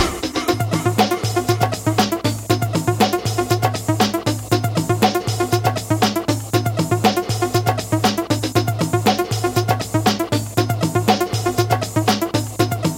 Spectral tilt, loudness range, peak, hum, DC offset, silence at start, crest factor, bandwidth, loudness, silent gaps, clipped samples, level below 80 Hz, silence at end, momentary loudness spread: -5 dB/octave; 0 LU; 0 dBFS; none; under 0.1%; 0 s; 18 dB; 17 kHz; -19 LUFS; none; under 0.1%; -44 dBFS; 0 s; 3 LU